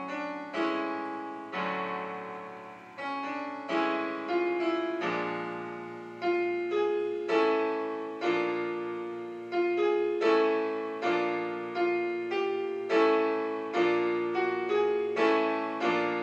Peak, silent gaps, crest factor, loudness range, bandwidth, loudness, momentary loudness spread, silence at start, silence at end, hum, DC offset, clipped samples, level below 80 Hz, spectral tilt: -12 dBFS; none; 18 dB; 6 LU; 8 kHz; -30 LUFS; 11 LU; 0 s; 0 s; none; under 0.1%; under 0.1%; -86 dBFS; -5.5 dB/octave